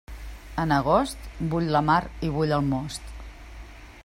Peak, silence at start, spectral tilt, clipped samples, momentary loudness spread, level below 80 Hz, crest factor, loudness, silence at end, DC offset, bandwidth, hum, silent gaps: -8 dBFS; 0.1 s; -6.5 dB/octave; under 0.1%; 23 LU; -40 dBFS; 18 dB; -25 LUFS; 0.05 s; under 0.1%; 16 kHz; none; none